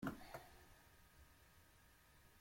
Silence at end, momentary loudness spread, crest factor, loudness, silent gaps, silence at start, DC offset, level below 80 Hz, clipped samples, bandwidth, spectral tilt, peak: 0 s; 13 LU; 26 dB; -61 LUFS; none; 0 s; under 0.1%; -70 dBFS; under 0.1%; 16.5 kHz; -5.5 dB/octave; -32 dBFS